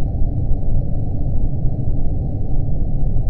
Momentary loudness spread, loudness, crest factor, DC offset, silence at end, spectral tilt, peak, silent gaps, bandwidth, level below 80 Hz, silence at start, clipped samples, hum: 1 LU; -23 LUFS; 12 dB; under 0.1%; 0 s; -14 dB/octave; -2 dBFS; none; 0.9 kHz; -18 dBFS; 0 s; under 0.1%; none